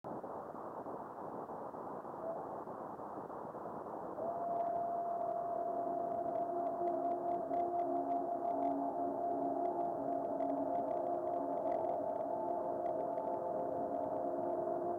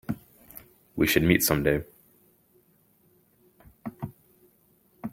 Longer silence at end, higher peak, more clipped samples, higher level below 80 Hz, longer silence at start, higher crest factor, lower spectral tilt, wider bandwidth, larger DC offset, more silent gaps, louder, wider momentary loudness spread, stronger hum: about the same, 0 s vs 0.05 s; second, -26 dBFS vs -4 dBFS; neither; second, -78 dBFS vs -50 dBFS; about the same, 0.05 s vs 0.1 s; second, 12 dB vs 26 dB; first, -9 dB/octave vs -4.5 dB/octave; second, 3.7 kHz vs 17 kHz; neither; neither; second, -39 LUFS vs -25 LUFS; second, 9 LU vs 26 LU; neither